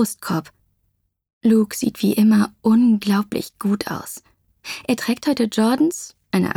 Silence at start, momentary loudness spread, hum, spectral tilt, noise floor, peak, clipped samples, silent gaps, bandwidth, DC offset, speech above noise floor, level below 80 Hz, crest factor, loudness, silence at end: 0 s; 14 LU; none; -5.5 dB/octave; -70 dBFS; -6 dBFS; under 0.1%; 1.33-1.41 s; 17.5 kHz; under 0.1%; 51 dB; -60 dBFS; 14 dB; -19 LUFS; 0.05 s